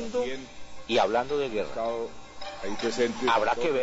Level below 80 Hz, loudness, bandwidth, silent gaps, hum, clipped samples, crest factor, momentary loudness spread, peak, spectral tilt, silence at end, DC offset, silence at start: -54 dBFS; -28 LUFS; 8 kHz; none; none; under 0.1%; 16 dB; 16 LU; -12 dBFS; -4 dB/octave; 0 s; under 0.1%; 0 s